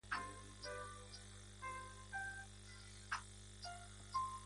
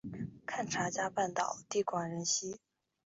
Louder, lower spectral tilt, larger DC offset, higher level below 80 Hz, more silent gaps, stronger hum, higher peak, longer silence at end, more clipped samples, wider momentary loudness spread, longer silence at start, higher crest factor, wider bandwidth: second, -50 LUFS vs -36 LUFS; about the same, -2.5 dB/octave vs -3.5 dB/octave; neither; first, -62 dBFS vs -72 dBFS; neither; first, 50 Hz at -60 dBFS vs none; second, -30 dBFS vs -20 dBFS; second, 0 s vs 0.5 s; neither; about the same, 10 LU vs 10 LU; about the same, 0.05 s vs 0.05 s; about the same, 20 dB vs 18 dB; first, 11.5 kHz vs 8 kHz